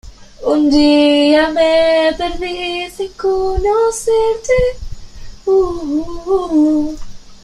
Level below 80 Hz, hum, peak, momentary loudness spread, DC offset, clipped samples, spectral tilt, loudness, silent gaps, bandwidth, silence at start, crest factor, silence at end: -32 dBFS; none; -2 dBFS; 12 LU; under 0.1%; under 0.1%; -4.5 dB/octave; -14 LUFS; none; 13 kHz; 0.05 s; 12 dB; 0.05 s